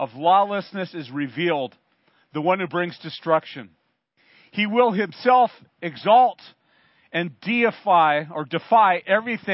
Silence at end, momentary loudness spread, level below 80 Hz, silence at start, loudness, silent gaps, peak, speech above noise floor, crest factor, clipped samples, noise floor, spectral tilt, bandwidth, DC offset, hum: 0 s; 14 LU; -78 dBFS; 0 s; -21 LUFS; none; -4 dBFS; 45 dB; 18 dB; under 0.1%; -66 dBFS; -10 dB/octave; 5.8 kHz; under 0.1%; none